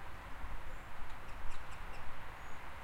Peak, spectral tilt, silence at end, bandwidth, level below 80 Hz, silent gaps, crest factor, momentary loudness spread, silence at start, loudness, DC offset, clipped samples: -24 dBFS; -4.5 dB/octave; 0 s; 11 kHz; -48 dBFS; none; 14 dB; 1 LU; 0 s; -50 LUFS; under 0.1%; under 0.1%